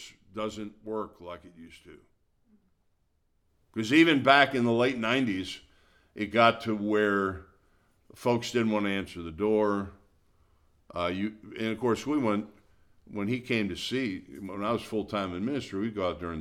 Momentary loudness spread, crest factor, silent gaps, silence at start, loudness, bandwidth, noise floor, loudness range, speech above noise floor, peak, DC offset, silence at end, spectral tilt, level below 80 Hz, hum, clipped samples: 18 LU; 24 dB; none; 0 s; -28 LUFS; 14.5 kHz; -72 dBFS; 8 LU; 43 dB; -6 dBFS; under 0.1%; 0 s; -5.5 dB/octave; -60 dBFS; none; under 0.1%